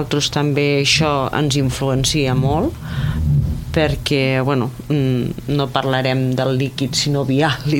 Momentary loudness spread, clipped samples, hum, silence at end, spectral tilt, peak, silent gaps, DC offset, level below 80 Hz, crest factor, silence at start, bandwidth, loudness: 5 LU; under 0.1%; none; 0 s; -5 dB/octave; 0 dBFS; none; under 0.1%; -32 dBFS; 18 dB; 0 s; 16.5 kHz; -18 LUFS